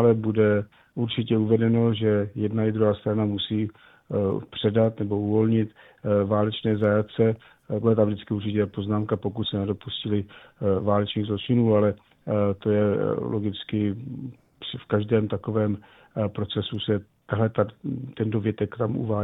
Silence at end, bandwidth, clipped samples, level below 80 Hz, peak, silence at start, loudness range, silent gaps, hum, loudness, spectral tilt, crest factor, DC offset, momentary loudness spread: 0 s; 4 kHz; under 0.1%; -58 dBFS; -6 dBFS; 0 s; 4 LU; none; none; -25 LUFS; -10.5 dB/octave; 18 dB; under 0.1%; 10 LU